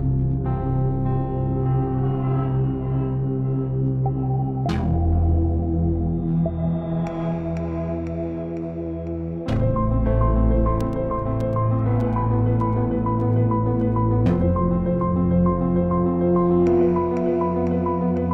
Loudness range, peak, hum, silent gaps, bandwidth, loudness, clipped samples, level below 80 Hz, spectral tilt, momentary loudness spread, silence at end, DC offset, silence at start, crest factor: 5 LU; -6 dBFS; none; none; 6 kHz; -22 LUFS; under 0.1%; -30 dBFS; -11 dB/octave; 7 LU; 0 s; 0.4%; 0 s; 14 dB